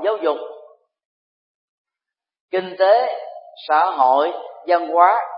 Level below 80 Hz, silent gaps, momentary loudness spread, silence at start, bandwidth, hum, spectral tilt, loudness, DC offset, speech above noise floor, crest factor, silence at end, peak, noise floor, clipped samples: -86 dBFS; 1.05-1.85 s, 2.40-2.49 s; 16 LU; 0 s; 5.4 kHz; none; -8 dB/octave; -18 LUFS; under 0.1%; 70 dB; 20 dB; 0 s; 0 dBFS; -88 dBFS; under 0.1%